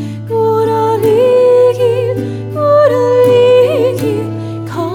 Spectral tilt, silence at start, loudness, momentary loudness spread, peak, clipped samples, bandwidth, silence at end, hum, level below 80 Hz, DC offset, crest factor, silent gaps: -7 dB/octave; 0 s; -11 LUFS; 11 LU; 0 dBFS; under 0.1%; 17 kHz; 0 s; none; -52 dBFS; under 0.1%; 10 dB; none